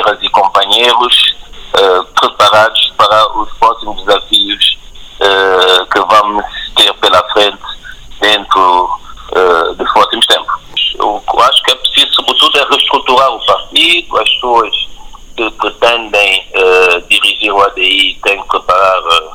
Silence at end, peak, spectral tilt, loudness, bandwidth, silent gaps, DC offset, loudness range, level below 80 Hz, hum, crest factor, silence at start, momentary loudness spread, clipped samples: 0 s; 0 dBFS; -1.5 dB/octave; -8 LUFS; over 20 kHz; none; under 0.1%; 2 LU; -36 dBFS; none; 10 dB; 0 s; 8 LU; 0.7%